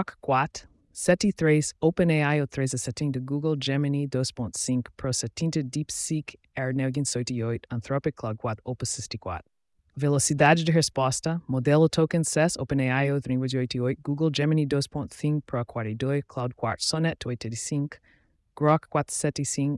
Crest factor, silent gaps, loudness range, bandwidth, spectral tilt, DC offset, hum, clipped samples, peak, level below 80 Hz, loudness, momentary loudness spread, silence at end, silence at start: 18 dB; none; 6 LU; 12 kHz; -5 dB/octave; under 0.1%; none; under 0.1%; -8 dBFS; -56 dBFS; -26 LUFS; 10 LU; 0 s; 0 s